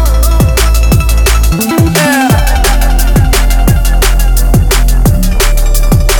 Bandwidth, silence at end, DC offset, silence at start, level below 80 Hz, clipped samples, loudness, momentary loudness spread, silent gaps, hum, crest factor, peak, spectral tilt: 19.5 kHz; 0 s; under 0.1%; 0 s; -8 dBFS; under 0.1%; -9 LUFS; 2 LU; none; none; 6 dB; 0 dBFS; -4.5 dB/octave